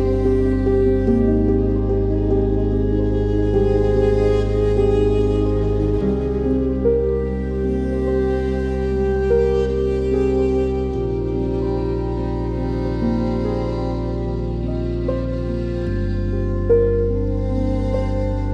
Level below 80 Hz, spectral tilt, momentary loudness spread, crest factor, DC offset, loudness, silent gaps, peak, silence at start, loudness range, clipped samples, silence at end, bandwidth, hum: -24 dBFS; -9.5 dB/octave; 6 LU; 14 dB; under 0.1%; -20 LUFS; none; -4 dBFS; 0 s; 4 LU; under 0.1%; 0 s; 7.8 kHz; none